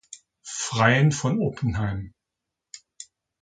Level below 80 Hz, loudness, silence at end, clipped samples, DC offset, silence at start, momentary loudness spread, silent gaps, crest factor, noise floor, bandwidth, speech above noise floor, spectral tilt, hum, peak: -48 dBFS; -23 LUFS; 0.4 s; under 0.1%; under 0.1%; 0.1 s; 26 LU; none; 22 dB; -85 dBFS; 9.4 kHz; 63 dB; -5 dB/octave; none; -4 dBFS